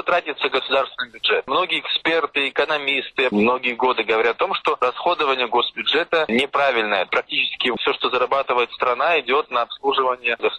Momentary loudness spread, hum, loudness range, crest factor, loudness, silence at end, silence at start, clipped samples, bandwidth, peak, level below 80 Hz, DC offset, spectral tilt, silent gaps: 3 LU; none; 1 LU; 16 dB; -20 LUFS; 0 s; 0 s; under 0.1%; 10 kHz; -6 dBFS; -60 dBFS; under 0.1%; -4.5 dB/octave; none